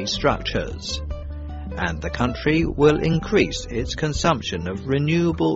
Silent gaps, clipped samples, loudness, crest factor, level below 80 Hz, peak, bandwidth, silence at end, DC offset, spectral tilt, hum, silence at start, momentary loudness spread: none; under 0.1%; -22 LUFS; 18 dB; -34 dBFS; -4 dBFS; 8 kHz; 0 s; under 0.1%; -5 dB/octave; none; 0 s; 11 LU